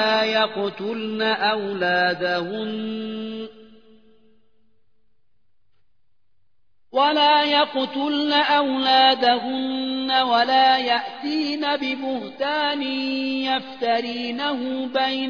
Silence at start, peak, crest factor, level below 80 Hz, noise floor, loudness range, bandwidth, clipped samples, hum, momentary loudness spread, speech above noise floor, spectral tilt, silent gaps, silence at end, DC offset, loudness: 0 s; -4 dBFS; 18 dB; -72 dBFS; -74 dBFS; 12 LU; 5.4 kHz; under 0.1%; none; 11 LU; 53 dB; -5 dB/octave; none; 0 s; 0.2%; -21 LUFS